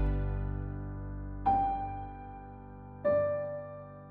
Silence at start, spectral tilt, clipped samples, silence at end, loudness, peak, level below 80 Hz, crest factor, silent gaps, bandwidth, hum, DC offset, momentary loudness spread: 0 s; -11 dB/octave; under 0.1%; 0 s; -34 LUFS; -16 dBFS; -40 dBFS; 16 dB; none; 4.3 kHz; none; under 0.1%; 18 LU